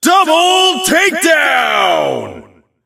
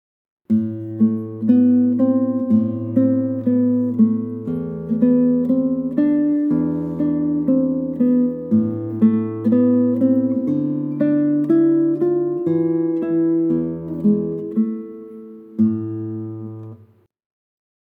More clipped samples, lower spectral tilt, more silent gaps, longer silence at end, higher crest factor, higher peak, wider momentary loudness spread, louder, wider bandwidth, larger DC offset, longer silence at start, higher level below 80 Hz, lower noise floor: neither; second, -1.5 dB/octave vs -12 dB/octave; neither; second, 0.45 s vs 1.15 s; about the same, 12 dB vs 14 dB; first, 0 dBFS vs -4 dBFS; about the same, 9 LU vs 10 LU; first, -10 LUFS vs -19 LUFS; first, 16.5 kHz vs 2.8 kHz; neither; second, 0 s vs 0.5 s; first, -54 dBFS vs -62 dBFS; second, -38 dBFS vs -51 dBFS